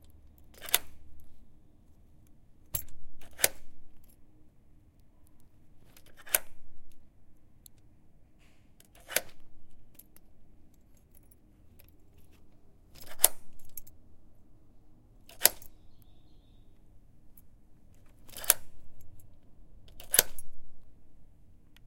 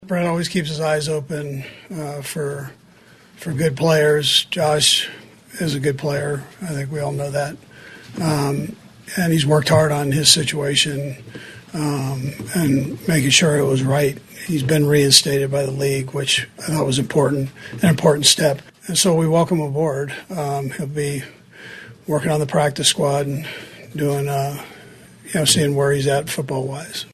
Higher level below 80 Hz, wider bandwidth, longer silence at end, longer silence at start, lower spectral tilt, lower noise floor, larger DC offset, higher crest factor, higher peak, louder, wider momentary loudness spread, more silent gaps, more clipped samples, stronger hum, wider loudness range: about the same, -56 dBFS vs -52 dBFS; first, 16.5 kHz vs 13 kHz; about the same, 0 s vs 0.1 s; about the same, 0 s vs 0 s; second, 0 dB/octave vs -4 dB/octave; first, -57 dBFS vs -48 dBFS; neither; first, 36 dB vs 20 dB; about the same, 0 dBFS vs 0 dBFS; second, -29 LUFS vs -18 LUFS; first, 27 LU vs 16 LU; neither; neither; neither; first, 10 LU vs 7 LU